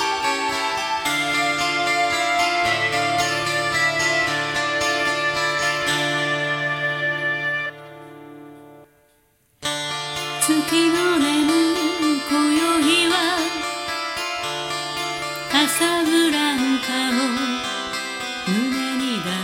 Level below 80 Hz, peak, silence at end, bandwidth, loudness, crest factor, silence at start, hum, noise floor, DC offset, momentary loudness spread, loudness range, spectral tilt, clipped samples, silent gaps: -58 dBFS; -4 dBFS; 0 s; 16.5 kHz; -20 LUFS; 18 dB; 0 s; none; -61 dBFS; under 0.1%; 8 LU; 6 LU; -2.5 dB/octave; under 0.1%; none